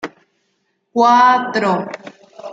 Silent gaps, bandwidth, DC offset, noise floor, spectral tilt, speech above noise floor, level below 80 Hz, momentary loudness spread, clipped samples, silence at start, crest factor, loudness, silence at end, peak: none; 7.8 kHz; under 0.1%; -67 dBFS; -5 dB/octave; 54 dB; -70 dBFS; 22 LU; under 0.1%; 0.05 s; 16 dB; -14 LUFS; 0 s; -2 dBFS